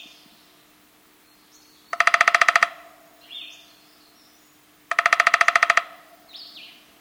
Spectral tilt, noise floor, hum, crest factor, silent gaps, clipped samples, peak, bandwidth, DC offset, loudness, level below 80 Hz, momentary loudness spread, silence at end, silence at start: 1 dB/octave; -56 dBFS; none; 24 dB; none; under 0.1%; 0 dBFS; over 20 kHz; under 0.1%; -18 LUFS; -72 dBFS; 25 LU; 0.4 s; 1.95 s